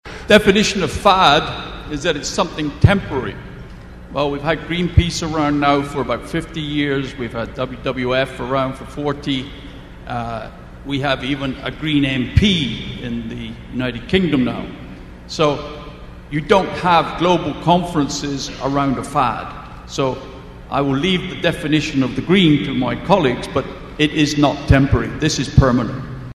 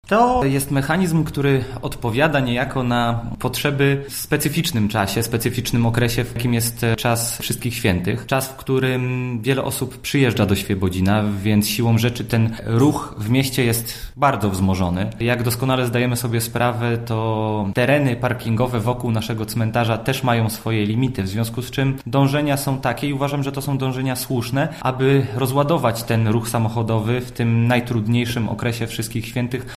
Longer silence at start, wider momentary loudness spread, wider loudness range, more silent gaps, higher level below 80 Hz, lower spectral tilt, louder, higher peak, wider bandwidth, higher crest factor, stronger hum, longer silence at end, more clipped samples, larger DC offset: about the same, 0.05 s vs 0.05 s; first, 16 LU vs 6 LU; first, 6 LU vs 2 LU; neither; first, -32 dBFS vs -42 dBFS; about the same, -5.5 dB/octave vs -5.5 dB/octave; about the same, -18 LUFS vs -20 LUFS; about the same, 0 dBFS vs -2 dBFS; second, 13 kHz vs 15.5 kHz; about the same, 18 dB vs 16 dB; neither; about the same, 0 s vs 0.05 s; neither; neither